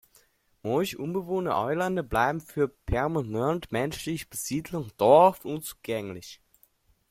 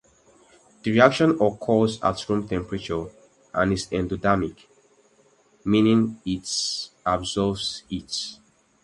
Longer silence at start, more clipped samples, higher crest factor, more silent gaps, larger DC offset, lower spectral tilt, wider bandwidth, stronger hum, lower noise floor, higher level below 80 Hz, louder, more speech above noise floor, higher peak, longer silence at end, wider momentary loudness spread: second, 0.65 s vs 0.85 s; neither; about the same, 22 dB vs 24 dB; neither; neither; about the same, -5.5 dB/octave vs -5 dB/octave; first, 16.5 kHz vs 11.5 kHz; neither; first, -65 dBFS vs -60 dBFS; about the same, -48 dBFS vs -48 dBFS; second, -27 LUFS vs -24 LUFS; about the same, 39 dB vs 37 dB; second, -6 dBFS vs 0 dBFS; first, 0.75 s vs 0.5 s; about the same, 15 LU vs 13 LU